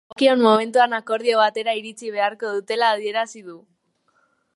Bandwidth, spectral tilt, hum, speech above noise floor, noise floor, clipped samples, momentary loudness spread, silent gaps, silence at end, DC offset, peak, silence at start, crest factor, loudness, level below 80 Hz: 11.5 kHz; -3.5 dB/octave; none; 46 dB; -66 dBFS; under 0.1%; 11 LU; none; 1 s; under 0.1%; -2 dBFS; 0.2 s; 20 dB; -20 LUFS; -78 dBFS